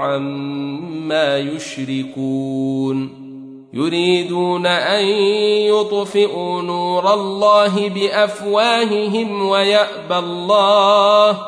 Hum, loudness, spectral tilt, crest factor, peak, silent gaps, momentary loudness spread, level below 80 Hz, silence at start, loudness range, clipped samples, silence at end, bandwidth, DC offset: none; -16 LUFS; -5 dB/octave; 16 dB; -2 dBFS; none; 12 LU; -66 dBFS; 0 s; 6 LU; under 0.1%; 0 s; 10.5 kHz; under 0.1%